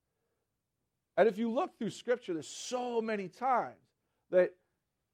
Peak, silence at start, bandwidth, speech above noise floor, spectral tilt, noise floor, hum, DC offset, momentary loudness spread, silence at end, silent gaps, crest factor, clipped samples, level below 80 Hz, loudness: -14 dBFS; 1.15 s; 12 kHz; 53 dB; -4.5 dB/octave; -85 dBFS; none; under 0.1%; 10 LU; 0.65 s; none; 20 dB; under 0.1%; -84 dBFS; -33 LUFS